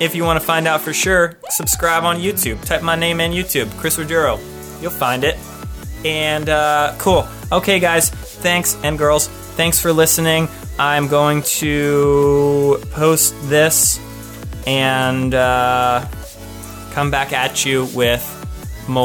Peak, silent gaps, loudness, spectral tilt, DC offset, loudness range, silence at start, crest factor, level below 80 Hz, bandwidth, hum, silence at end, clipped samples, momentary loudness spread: -2 dBFS; none; -16 LUFS; -3.5 dB/octave; under 0.1%; 4 LU; 0 s; 14 dB; -34 dBFS; over 20 kHz; none; 0 s; under 0.1%; 13 LU